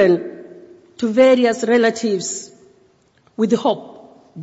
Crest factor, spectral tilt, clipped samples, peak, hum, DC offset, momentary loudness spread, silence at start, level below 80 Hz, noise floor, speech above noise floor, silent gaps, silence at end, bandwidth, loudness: 16 dB; -4.5 dB/octave; under 0.1%; -4 dBFS; none; under 0.1%; 17 LU; 0 s; -64 dBFS; -57 dBFS; 41 dB; none; 0 s; 8 kHz; -17 LUFS